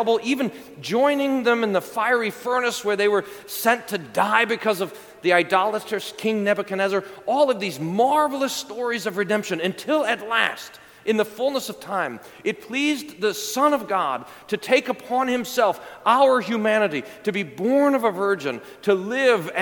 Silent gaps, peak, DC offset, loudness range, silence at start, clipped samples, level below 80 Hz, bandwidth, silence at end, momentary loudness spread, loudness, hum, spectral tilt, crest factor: none; -2 dBFS; under 0.1%; 3 LU; 0 s; under 0.1%; -70 dBFS; 19 kHz; 0 s; 8 LU; -22 LUFS; none; -4 dB/octave; 20 dB